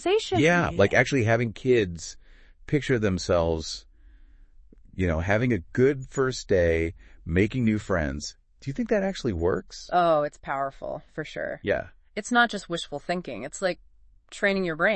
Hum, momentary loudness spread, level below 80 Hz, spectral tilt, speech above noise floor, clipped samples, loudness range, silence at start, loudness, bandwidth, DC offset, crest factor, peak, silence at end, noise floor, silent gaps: none; 14 LU; -46 dBFS; -5.5 dB/octave; 27 dB; under 0.1%; 4 LU; 0 s; -26 LUFS; 8.8 kHz; under 0.1%; 22 dB; -4 dBFS; 0 s; -52 dBFS; none